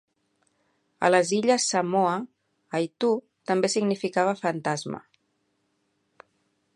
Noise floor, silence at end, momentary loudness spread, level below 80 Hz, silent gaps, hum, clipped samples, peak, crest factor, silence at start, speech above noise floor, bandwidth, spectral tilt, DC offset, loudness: -73 dBFS; 1.75 s; 11 LU; -76 dBFS; none; none; under 0.1%; -6 dBFS; 22 dB; 1 s; 49 dB; 11.5 kHz; -4 dB/octave; under 0.1%; -25 LUFS